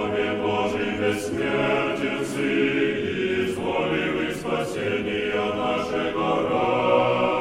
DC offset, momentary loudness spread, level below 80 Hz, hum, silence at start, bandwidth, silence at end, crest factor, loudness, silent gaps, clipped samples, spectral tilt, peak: under 0.1%; 5 LU; -52 dBFS; none; 0 s; 15.5 kHz; 0 s; 16 dB; -24 LUFS; none; under 0.1%; -5.5 dB/octave; -6 dBFS